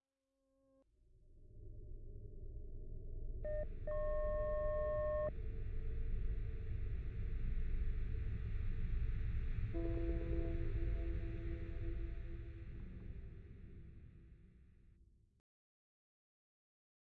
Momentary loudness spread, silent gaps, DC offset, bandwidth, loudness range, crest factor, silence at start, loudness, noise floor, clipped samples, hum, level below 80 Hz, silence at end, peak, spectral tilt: 17 LU; none; under 0.1%; 4.1 kHz; 15 LU; 14 dB; 1.25 s; -45 LUFS; -87 dBFS; under 0.1%; none; -44 dBFS; 2.3 s; -28 dBFS; -8.5 dB/octave